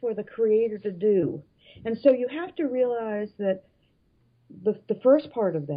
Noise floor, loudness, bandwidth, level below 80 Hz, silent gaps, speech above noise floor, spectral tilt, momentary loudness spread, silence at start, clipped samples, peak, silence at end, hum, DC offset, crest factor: -66 dBFS; -25 LUFS; 5.2 kHz; -70 dBFS; none; 41 dB; -11 dB/octave; 10 LU; 0 s; under 0.1%; -8 dBFS; 0 s; none; under 0.1%; 18 dB